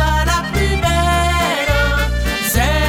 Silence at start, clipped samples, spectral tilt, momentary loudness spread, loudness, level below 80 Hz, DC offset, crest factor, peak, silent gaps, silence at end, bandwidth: 0 s; under 0.1%; -4 dB/octave; 3 LU; -16 LUFS; -20 dBFS; under 0.1%; 12 dB; -2 dBFS; none; 0 s; 19 kHz